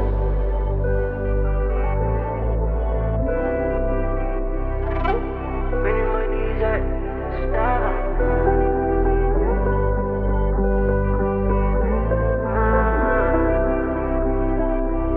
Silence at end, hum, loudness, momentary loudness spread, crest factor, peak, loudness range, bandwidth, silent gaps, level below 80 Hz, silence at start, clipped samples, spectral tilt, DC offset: 0 s; none; -22 LUFS; 6 LU; 14 dB; -6 dBFS; 3 LU; 3.6 kHz; none; -22 dBFS; 0 s; under 0.1%; -11.5 dB/octave; under 0.1%